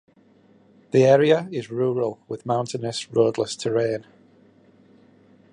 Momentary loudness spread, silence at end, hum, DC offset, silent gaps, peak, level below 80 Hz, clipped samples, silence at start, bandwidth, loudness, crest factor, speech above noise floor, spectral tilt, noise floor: 12 LU; 1.5 s; none; under 0.1%; none; -4 dBFS; -68 dBFS; under 0.1%; 0.95 s; 11 kHz; -22 LUFS; 20 dB; 35 dB; -6 dB/octave; -56 dBFS